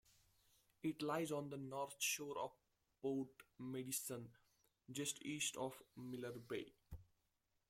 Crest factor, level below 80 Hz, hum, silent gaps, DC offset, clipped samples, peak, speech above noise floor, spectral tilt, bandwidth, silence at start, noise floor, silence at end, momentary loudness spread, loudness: 20 dB; -76 dBFS; none; none; under 0.1%; under 0.1%; -28 dBFS; 39 dB; -3.5 dB/octave; 16.5 kHz; 0.85 s; -86 dBFS; 0.65 s; 13 LU; -46 LUFS